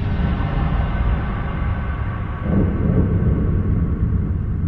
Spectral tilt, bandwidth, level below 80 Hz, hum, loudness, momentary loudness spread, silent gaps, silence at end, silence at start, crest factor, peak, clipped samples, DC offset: -11 dB/octave; 4.4 kHz; -22 dBFS; none; -21 LUFS; 6 LU; none; 0 s; 0 s; 14 dB; -4 dBFS; under 0.1%; under 0.1%